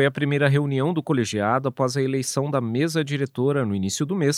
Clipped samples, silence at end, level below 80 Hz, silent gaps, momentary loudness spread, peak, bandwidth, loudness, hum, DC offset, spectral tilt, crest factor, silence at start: under 0.1%; 0 s; -68 dBFS; none; 4 LU; -4 dBFS; 15 kHz; -23 LUFS; none; under 0.1%; -5.5 dB/octave; 18 dB; 0 s